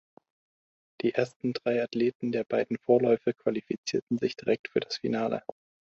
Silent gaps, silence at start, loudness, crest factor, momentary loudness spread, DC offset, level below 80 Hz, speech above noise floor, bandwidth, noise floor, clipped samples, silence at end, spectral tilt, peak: 1.36-1.40 s, 2.15-2.20 s, 3.78-3.84 s, 4.02-4.07 s, 4.59-4.64 s; 1.05 s; -29 LUFS; 20 dB; 7 LU; under 0.1%; -70 dBFS; over 62 dB; 8 kHz; under -90 dBFS; under 0.1%; 0.55 s; -5.5 dB/octave; -8 dBFS